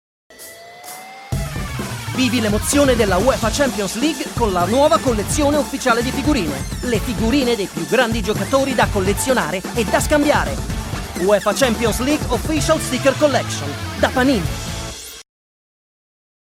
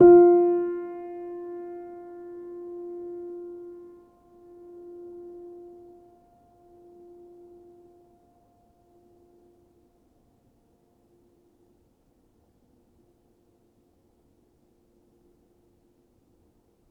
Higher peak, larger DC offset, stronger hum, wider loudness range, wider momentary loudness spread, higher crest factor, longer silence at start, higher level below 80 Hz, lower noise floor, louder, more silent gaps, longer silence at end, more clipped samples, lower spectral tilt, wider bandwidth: about the same, -2 dBFS vs -4 dBFS; neither; neither; second, 3 LU vs 23 LU; second, 11 LU vs 29 LU; second, 16 dB vs 24 dB; first, 0.3 s vs 0 s; first, -32 dBFS vs -64 dBFS; second, -38 dBFS vs -65 dBFS; first, -18 LUFS vs -25 LUFS; neither; second, 1.25 s vs 13.35 s; neither; second, -4.5 dB/octave vs -11 dB/octave; first, 16.5 kHz vs 2.2 kHz